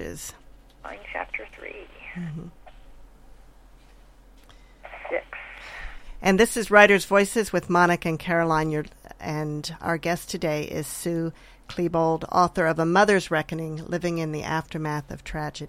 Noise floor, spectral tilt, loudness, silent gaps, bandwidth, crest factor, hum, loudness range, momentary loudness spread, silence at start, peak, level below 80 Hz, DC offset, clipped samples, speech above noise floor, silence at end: -51 dBFS; -5 dB/octave; -24 LUFS; none; 16.5 kHz; 24 dB; none; 19 LU; 20 LU; 0 s; -2 dBFS; -48 dBFS; under 0.1%; under 0.1%; 27 dB; 0 s